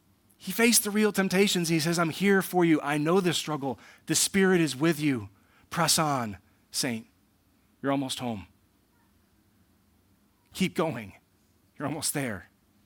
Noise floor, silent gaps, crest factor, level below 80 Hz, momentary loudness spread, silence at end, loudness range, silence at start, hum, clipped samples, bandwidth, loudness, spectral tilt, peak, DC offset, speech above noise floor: -66 dBFS; none; 22 dB; -68 dBFS; 16 LU; 0.45 s; 12 LU; 0.4 s; none; under 0.1%; 18 kHz; -26 LUFS; -4 dB/octave; -6 dBFS; under 0.1%; 39 dB